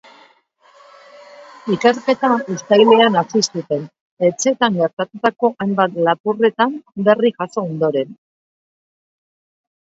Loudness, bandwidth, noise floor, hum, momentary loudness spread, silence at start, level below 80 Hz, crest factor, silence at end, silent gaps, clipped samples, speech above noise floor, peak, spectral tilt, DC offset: -17 LUFS; 8 kHz; -54 dBFS; none; 11 LU; 1.4 s; -68 dBFS; 18 dB; 1.75 s; 4.01-4.17 s, 4.93-4.97 s, 6.20-6.24 s; under 0.1%; 37 dB; 0 dBFS; -4.5 dB/octave; under 0.1%